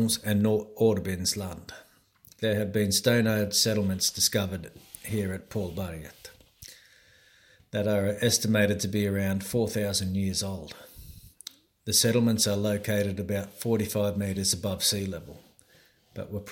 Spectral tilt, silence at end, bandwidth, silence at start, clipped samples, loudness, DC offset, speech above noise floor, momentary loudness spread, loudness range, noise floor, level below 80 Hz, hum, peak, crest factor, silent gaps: -4 dB/octave; 0 s; 17 kHz; 0 s; under 0.1%; -27 LUFS; under 0.1%; 34 dB; 21 LU; 5 LU; -61 dBFS; -56 dBFS; none; -8 dBFS; 20 dB; none